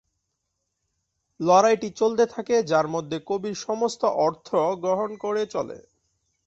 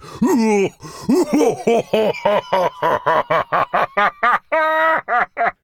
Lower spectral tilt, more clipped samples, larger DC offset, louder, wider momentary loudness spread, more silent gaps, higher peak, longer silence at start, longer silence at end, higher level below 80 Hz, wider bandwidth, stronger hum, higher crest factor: about the same, -5 dB/octave vs -5 dB/octave; neither; neither; second, -24 LUFS vs -17 LUFS; first, 10 LU vs 4 LU; neither; second, -6 dBFS vs -2 dBFS; first, 1.4 s vs 0 s; first, 0.7 s vs 0.1 s; second, -68 dBFS vs -54 dBFS; second, 8 kHz vs 17.5 kHz; neither; about the same, 20 dB vs 16 dB